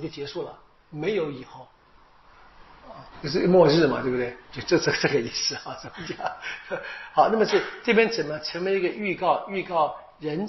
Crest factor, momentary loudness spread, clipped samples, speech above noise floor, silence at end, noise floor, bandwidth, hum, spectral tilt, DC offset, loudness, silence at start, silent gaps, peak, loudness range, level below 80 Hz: 20 dB; 16 LU; under 0.1%; 30 dB; 0 s; -55 dBFS; 6.2 kHz; none; -3.5 dB/octave; under 0.1%; -24 LUFS; 0 s; none; -4 dBFS; 4 LU; -56 dBFS